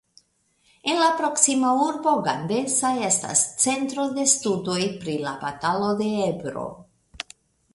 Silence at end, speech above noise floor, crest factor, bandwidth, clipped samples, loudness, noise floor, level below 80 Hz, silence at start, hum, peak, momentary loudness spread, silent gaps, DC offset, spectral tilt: 0.5 s; 42 dB; 22 dB; 11.5 kHz; under 0.1%; -22 LUFS; -65 dBFS; -62 dBFS; 0.85 s; none; -2 dBFS; 12 LU; none; under 0.1%; -3 dB/octave